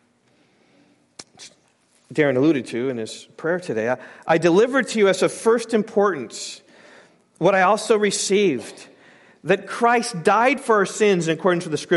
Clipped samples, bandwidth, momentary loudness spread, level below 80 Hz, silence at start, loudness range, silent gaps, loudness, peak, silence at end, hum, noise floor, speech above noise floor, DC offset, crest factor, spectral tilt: under 0.1%; 11.5 kHz; 13 LU; -72 dBFS; 1.2 s; 4 LU; none; -20 LUFS; -4 dBFS; 0 s; none; -61 dBFS; 41 dB; under 0.1%; 18 dB; -4.5 dB/octave